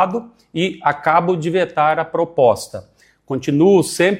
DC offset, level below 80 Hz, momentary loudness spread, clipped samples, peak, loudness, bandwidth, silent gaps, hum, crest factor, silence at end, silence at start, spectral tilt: under 0.1%; -58 dBFS; 14 LU; under 0.1%; -2 dBFS; -17 LUFS; 16 kHz; none; none; 16 dB; 0 s; 0 s; -5.5 dB/octave